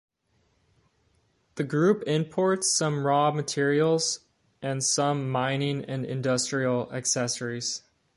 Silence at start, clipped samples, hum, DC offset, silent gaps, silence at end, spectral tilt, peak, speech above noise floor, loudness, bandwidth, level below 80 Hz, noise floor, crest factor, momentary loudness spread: 1.55 s; under 0.1%; none; under 0.1%; none; 0.4 s; -4 dB/octave; -10 dBFS; 44 dB; -26 LUFS; 11.5 kHz; -68 dBFS; -70 dBFS; 16 dB; 9 LU